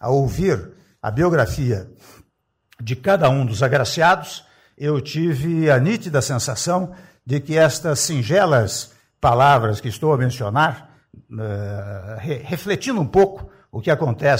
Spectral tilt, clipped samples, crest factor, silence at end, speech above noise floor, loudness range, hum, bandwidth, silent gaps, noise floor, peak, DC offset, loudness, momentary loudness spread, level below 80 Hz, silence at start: -5.5 dB/octave; under 0.1%; 14 dB; 0 s; 49 dB; 5 LU; none; 16 kHz; none; -68 dBFS; -6 dBFS; under 0.1%; -19 LUFS; 14 LU; -44 dBFS; 0 s